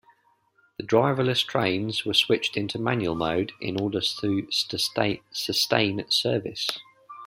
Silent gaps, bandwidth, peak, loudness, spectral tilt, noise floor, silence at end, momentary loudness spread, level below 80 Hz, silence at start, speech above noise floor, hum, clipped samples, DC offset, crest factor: none; 16 kHz; -4 dBFS; -25 LUFS; -4 dB/octave; -65 dBFS; 0 s; 7 LU; -60 dBFS; 0.8 s; 40 dB; none; under 0.1%; under 0.1%; 22 dB